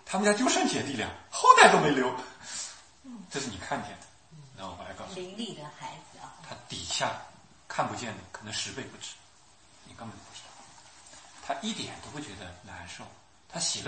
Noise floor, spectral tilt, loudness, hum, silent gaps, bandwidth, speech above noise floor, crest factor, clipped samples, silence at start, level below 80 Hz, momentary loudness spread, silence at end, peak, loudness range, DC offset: -59 dBFS; -3 dB/octave; -27 LUFS; none; none; 8.8 kHz; 30 dB; 28 dB; under 0.1%; 0.05 s; -64 dBFS; 22 LU; 0 s; -2 dBFS; 16 LU; under 0.1%